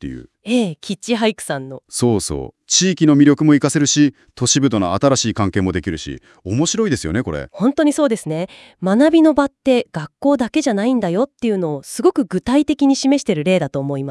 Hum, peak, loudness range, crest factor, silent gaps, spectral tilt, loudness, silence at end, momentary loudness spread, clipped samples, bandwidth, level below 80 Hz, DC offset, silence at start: none; 0 dBFS; 4 LU; 16 dB; none; -4.5 dB/octave; -17 LUFS; 0 s; 12 LU; under 0.1%; 12 kHz; -46 dBFS; under 0.1%; 0 s